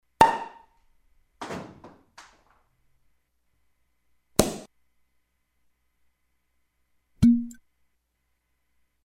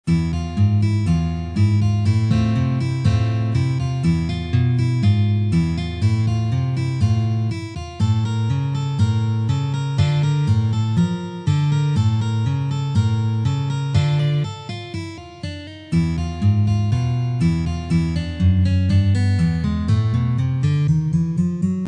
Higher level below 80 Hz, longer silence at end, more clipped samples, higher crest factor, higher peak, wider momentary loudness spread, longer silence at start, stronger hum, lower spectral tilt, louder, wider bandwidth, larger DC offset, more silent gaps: second, -50 dBFS vs -36 dBFS; first, 1.6 s vs 0 s; neither; first, 28 dB vs 12 dB; about the same, -4 dBFS vs -6 dBFS; first, 21 LU vs 5 LU; first, 0.2 s vs 0.05 s; neither; second, -5 dB/octave vs -7.5 dB/octave; second, -24 LUFS vs -20 LUFS; first, 16 kHz vs 9.8 kHz; neither; neither